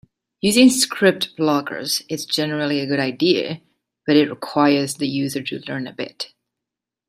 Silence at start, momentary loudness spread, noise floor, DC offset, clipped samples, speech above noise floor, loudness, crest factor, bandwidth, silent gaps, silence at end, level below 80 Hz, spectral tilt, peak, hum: 0.45 s; 15 LU; -85 dBFS; under 0.1%; under 0.1%; 66 dB; -19 LUFS; 18 dB; 16 kHz; none; 0.85 s; -62 dBFS; -4 dB/octave; -2 dBFS; none